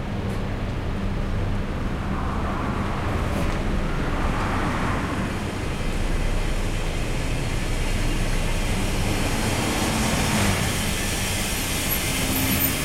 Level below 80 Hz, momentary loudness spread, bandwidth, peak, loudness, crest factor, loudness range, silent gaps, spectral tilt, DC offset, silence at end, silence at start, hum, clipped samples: -28 dBFS; 7 LU; 16 kHz; -8 dBFS; -25 LUFS; 14 dB; 4 LU; none; -4.5 dB/octave; under 0.1%; 0 s; 0 s; none; under 0.1%